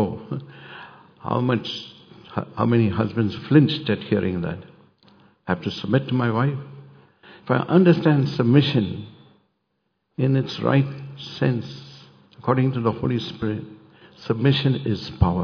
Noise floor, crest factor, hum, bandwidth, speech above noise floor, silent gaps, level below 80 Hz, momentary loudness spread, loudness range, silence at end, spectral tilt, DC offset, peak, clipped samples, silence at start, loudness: -74 dBFS; 20 dB; none; 5.4 kHz; 53 dB; none; -46 dBFS; 19 LU; 5 LU; 0 s; -8.5 dB/octave; under 0.1%; -2 dBFS; under 0.1%; 0 s; -22 LUFS